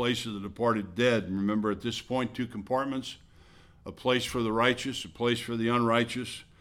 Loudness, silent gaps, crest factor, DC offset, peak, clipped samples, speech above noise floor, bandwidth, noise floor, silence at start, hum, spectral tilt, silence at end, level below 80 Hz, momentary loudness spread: -29 LUFS; none; 20 dB; under 0.1%; -10 dBFS; under 0.1%; 26 dB; 16 kHz; -56 dBFS; 0 s; none; -5 dB/octave; 0.2 s; -58 dBFS; 11 LU